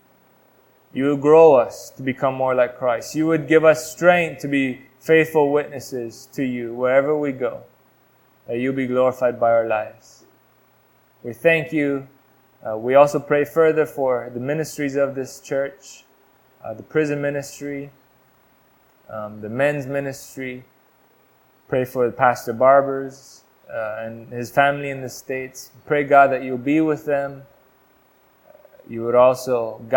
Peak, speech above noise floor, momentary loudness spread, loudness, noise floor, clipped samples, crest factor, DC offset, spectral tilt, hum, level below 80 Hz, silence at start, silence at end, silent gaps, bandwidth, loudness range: 0 dBFS; 38 dB; 17 LU; -20 LUFS; -58 dBFS; under 0.1%; 20 dB; under 0.1%; -6 dB/octave; none; -62 dBFS; 0.95 s; 0 s; none; 18 kHz; 9 LU